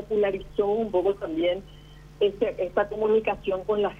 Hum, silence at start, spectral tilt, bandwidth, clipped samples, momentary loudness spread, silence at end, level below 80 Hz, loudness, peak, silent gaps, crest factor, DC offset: 50 Hz at -50 dBFS; 0 s; -7 dB/octave; 6.8 kHz; under 0.1%; 4 LU; 0 s; -50 dBFS; -26 LUFS; -10 dBFS; none; 16 dB; under 0.1%